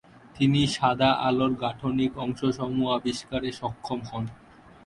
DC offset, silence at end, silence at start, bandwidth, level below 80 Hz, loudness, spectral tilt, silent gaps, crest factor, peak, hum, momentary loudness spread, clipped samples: under 0.1%; 0.5 s; 0.35 s; 11.5 kHz; -54 dBFS; -26 LUFS; -6 dB/octave; none; 18 dB; -8 dBFS; none; 11 LU; under 0.1%